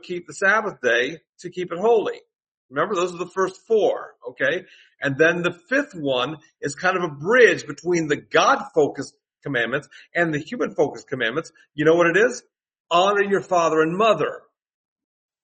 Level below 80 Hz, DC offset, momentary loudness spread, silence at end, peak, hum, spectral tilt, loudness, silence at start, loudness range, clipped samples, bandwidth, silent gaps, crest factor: -68 dBFS; under 0.1%; 13 LU; 1.05 s; -2 dBFS; none; -4.5 dB/octave; -21 LUFS; 0.05 s; 4 LU; under 0.1%; 8.4 kHz; 1.29-1.33 s, 2.48-2.69 s, 12.80-12.84 s; 20 dB